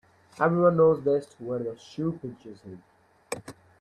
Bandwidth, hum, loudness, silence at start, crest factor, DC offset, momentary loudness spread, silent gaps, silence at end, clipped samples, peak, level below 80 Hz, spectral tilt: 12 kHz; none; -25 LUFS; 0.4 s; 20 dB; under 0.1%; 24 LU; none; 0.3 s; under 0.1%; -8 dBFS; -64 dBFS; -7.5 dB/octave